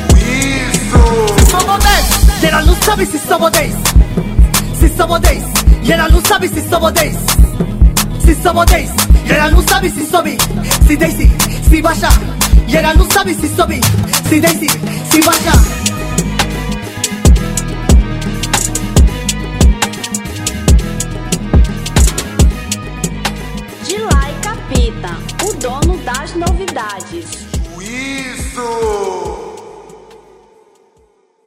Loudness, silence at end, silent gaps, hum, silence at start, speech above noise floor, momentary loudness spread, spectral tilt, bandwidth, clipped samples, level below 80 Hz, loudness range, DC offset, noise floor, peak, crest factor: -12 LUFS; 1.3 s; none; none; 0 s; 42 dB; 11 LU; -4.5 dB/octave; 16.5 kHz; 0.5%; -14 dBFS; 8 LU; under 0.1%; -52 dBFS; 0 dBFS; 12 dB